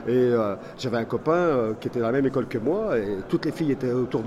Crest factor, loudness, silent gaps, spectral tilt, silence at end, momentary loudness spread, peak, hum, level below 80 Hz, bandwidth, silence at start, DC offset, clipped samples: 14 dB; -25 LUFS; none; -7.5 dB/octave; 0 s; 6 LU; -10 dBFS; none; -52 dBFS; 14 kHz; 0 s; under 0.1%; under 0.1%